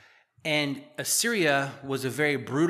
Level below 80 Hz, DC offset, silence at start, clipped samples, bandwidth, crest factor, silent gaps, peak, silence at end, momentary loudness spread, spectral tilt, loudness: -76 dBFS; under 0.1%; 0.45 s; under 0.1%; 15 kHz; 18 dB; none; -10 dBFS; 0 s; 9 LU; -3.5 dB/octave; -27 LUFS